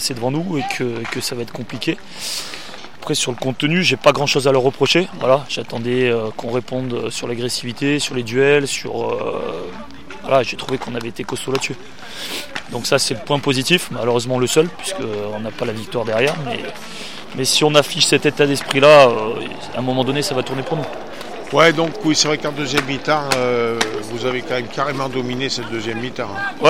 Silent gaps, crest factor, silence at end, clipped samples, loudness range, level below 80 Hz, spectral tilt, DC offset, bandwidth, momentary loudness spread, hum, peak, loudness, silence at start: none; 18 dB; 0 s; under 0.1%; 7 LU; -54 dBFS; -4 dB/octave; 2%; 16.5 kHz; 13 LU; none; 0 dBFS; -18 LUFS; 0 s